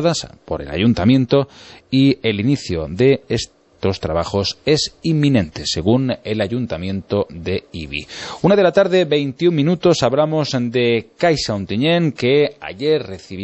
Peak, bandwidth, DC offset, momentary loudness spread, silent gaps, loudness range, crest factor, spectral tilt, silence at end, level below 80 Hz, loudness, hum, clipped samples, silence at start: -2 dBFS; 8.4 kHz; under 0.1%; 10 LU; none; 3 LU; 16 dB; -6 dB/octave; 0 s; -44 dBFS; -18 LUFS; none; under 0.1%; 0 s